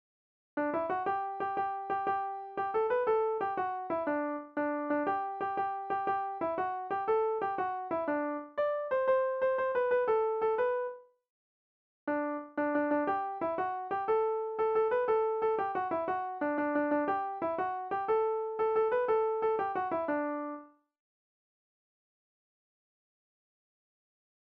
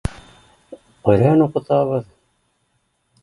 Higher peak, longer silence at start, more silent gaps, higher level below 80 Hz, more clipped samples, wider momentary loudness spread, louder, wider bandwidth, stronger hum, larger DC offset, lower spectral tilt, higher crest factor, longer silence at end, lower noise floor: second, -18 dBFS vs 0 dBFS; first, 0.55 s vs 0.05 s; first, 11.30-12.07 s vs none; second, -74 dBFS vs -40 dBFS; neither; second, 6 LU vs 11 LU; second, -32 LUFS vs -17 LUFS; second, 5.2 kHz vs 11.5 kHz; neither; neither; second, -4 dB/octave vs -9 dB/octave; second, 14 dB vs 20 dB; first, 3.85 s vs 1.2 s; first, under -90 dBFS vs -67 dBFS